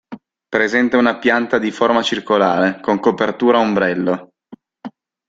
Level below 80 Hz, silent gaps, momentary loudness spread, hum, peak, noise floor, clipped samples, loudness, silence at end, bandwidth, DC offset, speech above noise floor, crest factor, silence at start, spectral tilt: -58 dBFS; none; 10 LU; none; 0 dBFS; -44 dBFS; under 0.1%; -16 LUFS; 0.4 s; 7.8 kHz; under 0.1%; 28 dB; 16 dB; 0.1 s; -5.5 dB/octave